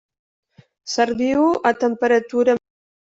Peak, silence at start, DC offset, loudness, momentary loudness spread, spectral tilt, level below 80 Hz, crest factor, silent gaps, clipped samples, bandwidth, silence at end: -4 dBFS; 0.85 s; under 0.1%; -19 LUFS; 7 LU; -4 dB/octave; -60 dBFS; 16 dB; none; under 0.1%; 8 kHz; 0.65 s